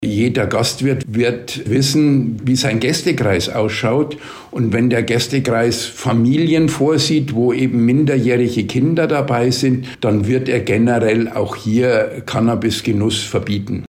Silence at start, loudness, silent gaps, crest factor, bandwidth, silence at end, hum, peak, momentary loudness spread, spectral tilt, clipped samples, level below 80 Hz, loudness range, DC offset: 0 s; -16 LUFS; none; 10 dB; 16 kHz; 0 s; none; -6 dBFS; 5 LU; -5.5 dB/octave; under 0.1%; -48 dBFS; 2 LU; under 0.1%